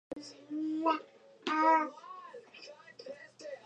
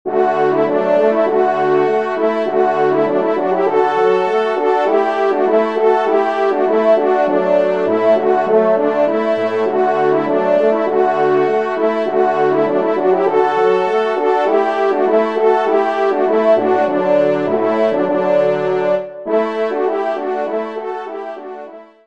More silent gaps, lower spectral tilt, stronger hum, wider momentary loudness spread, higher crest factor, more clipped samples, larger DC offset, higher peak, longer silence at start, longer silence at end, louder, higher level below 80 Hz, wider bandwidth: neither; second, -3.5 dB/octave vs -7 dB/octave; neither; first, 23 LU vs 5 LU; first, 20 dB vs 14 dB; neither; second, under 0.1% vs 0.5%; second, -16 dBFS vs 0 dBFS; about the same, 0.1 s vs 0.05 s; second, 0.05 s vs 0.25 s; second, -32 LUFS vs -15 LUFS; second, -84 dBFS vs -66 dBFS; first, 9.2 kHz vs 7.4 kHz